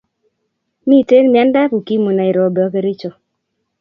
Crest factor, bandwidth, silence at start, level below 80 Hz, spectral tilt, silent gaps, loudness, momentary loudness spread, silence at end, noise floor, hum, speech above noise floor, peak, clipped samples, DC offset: 14 dB; 5.8 kHz; 0.85 s; -64 dBFS; -9 dB/octave; none; -13 LUFS; 13 LU; 0.7 s; -71 dBFS; none; 59 dB; 0 dBFS; under 0.1%; under 0.1%